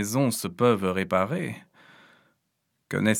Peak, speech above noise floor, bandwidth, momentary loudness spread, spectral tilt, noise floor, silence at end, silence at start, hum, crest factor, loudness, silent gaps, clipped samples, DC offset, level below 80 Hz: -6 dBFS; 52 dB; 19 kHz; 11 LU; -5 dB/octave; -77 dBFS; 0 s; 0 s; none; 20 dB; -26 LUFS; none; under 0.1%; under 0.1%; -68 dBFS